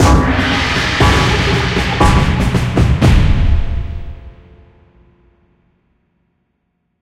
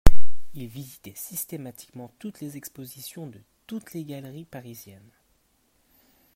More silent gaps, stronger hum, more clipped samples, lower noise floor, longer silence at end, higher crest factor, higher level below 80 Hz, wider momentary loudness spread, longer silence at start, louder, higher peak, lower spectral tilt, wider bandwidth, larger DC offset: neither; neither; second, under 0.1% vs 0.2%; about the same, -67 dBFS vs -67 dBFS; first, 2.7 s vs 0 s; second, 14 dB vs 20 dB; first, -20 dBFS vs -32 dBFS; about the same, 12 LU vs 12 LU; about the same, 0 s vs 0.05 s; first, -13 LUFS vs -37 LUFS; about the same, 0 dBFS vs 0 dBFS; about the same, -5.5 dB/octave vs -5.5 dB/octave; second, 14.5 kHz vs 16 kHz; neither